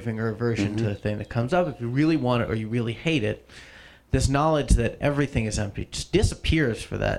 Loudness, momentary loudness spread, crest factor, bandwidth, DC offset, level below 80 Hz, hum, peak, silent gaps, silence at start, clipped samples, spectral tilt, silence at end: -25 LUFS; 8 LU; 18 dB; 12.5 kHz; under 0.1%; -34 dBFS; none; -6 dBFS; none; 0 s; under 0.1%; -6 dB/octave; 0 s